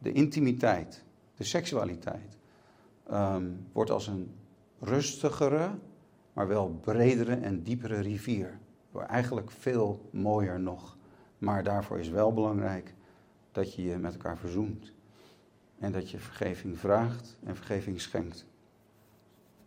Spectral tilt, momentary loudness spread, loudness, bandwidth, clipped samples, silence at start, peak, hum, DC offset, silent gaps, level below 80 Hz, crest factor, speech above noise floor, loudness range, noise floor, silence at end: -6.5 dB/octave; 15 LU; -32 LUFS; 16 kHz; under 0.1%; 0 s; -12 dBFS; none; under 0.1%; none; -60 dBFS; 22 dB; 32 dB; 5 LU; -63 dBFS; 1.25 s